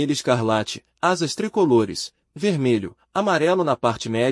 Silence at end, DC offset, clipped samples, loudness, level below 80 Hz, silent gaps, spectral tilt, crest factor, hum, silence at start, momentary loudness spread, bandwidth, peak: 0 s; under 0.1%; under 0.1%; -22 LUFS; -60 dBFS; none; -5 dB/octave; 16 dB; none; 0 s; 8 LU; 12 kHz; -4 dBFS